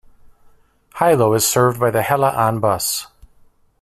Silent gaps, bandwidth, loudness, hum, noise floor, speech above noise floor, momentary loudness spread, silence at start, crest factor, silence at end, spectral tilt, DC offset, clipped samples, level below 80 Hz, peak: none; 16 kHz; -17 LUFS; none; -52 dBFS; 36 dB; 7 LU; 0.95 s; 16 dB; 0.75 s; -4 dB/octave; under 0.1%; under 0.1%; -50 dBFS; -2 dBFS